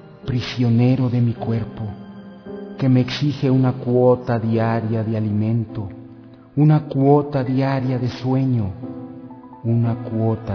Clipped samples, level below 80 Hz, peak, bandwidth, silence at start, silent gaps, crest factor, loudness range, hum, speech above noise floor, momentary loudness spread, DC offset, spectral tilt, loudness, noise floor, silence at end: under 0.1%; -50 dBFS; -2 dBFS; 5.4 kHz; 0 s; none; 16 dB; 2 LU; none; 24 dB; 18 LU; under 0.1%; -9 dB/octave; -19 LUFS; -42 dBFS; 0 s